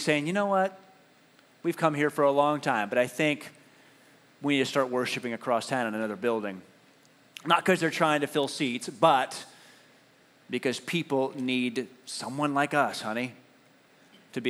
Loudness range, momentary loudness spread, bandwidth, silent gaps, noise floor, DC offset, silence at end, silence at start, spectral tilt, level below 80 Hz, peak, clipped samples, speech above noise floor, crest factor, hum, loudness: 3 LU; 12 LU; 14 kHz; none; -60 dBFS; under 0.1%; 0 s; 0 s; -4.5 dB/octave; -86 dBFS; -6 dBFS; under 0.1%; 33 dB; 22 dB; none; -28 LUFS